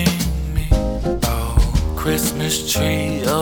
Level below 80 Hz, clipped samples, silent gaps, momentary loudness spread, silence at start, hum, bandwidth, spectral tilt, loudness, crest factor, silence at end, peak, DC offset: -22 dBFS; under 0.1%; none; 3 LU; 0 s; none; over 20 kHz; -4.5 dB/octave; -20 LUFS; 16 dB; 0 s; -2 dBFS; under 0.1%